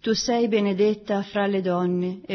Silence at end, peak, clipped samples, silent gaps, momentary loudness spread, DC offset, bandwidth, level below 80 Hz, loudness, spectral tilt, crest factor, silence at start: 0 s; -10 dBFS; under 0.1%; none; 5 LU; under 0.1%; 6.4 kHz; -58 dBFS; -23 LUFS; -5.5 dB/octave; 14 dB; 0.05 s